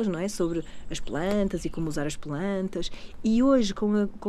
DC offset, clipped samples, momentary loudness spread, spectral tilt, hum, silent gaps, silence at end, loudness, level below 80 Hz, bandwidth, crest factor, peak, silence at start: under 0.1%; under 0.1%; 12 LU; -6 dB/octave; none; none; 0 s; -27 LUFS; -42 dBFS; 13 kHz; 14 dB; -12 dBFS; 0 s